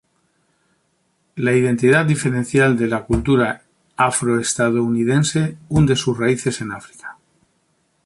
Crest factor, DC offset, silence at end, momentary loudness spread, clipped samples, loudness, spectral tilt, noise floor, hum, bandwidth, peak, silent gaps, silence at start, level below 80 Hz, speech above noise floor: 16 dB; under 0.1%; 0.95 s; 17 LU; under 0.1%; -18 LUFS; -5.5 dB/octave; -65 dBFS; none; 11.5 kHz; -2 dBFS; none; 1.35 s; -42 dBFS; 48 dB